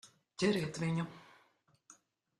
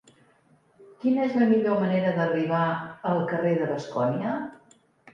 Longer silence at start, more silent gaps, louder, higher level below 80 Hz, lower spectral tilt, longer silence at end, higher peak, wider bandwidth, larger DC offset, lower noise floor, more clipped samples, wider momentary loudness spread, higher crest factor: second, 0.05 s vs 0.8 s; neither; second, -36 LUFS vs -25 LUFS; about the same, -72 dBFS vs -70 dBFS; second, -5.5 dB/octave vs -8 dB/octave; second, 0.45 s vs 0.6 s; second, -20 dBFS vs -10 dBFS; first, 12.5 kHz vs 7.6 kHz; neither; first, -72 dBFS vs -62 dBFS; neither; first, 19 LU vs 9 LU; about the same, 20 dB vs 16 dB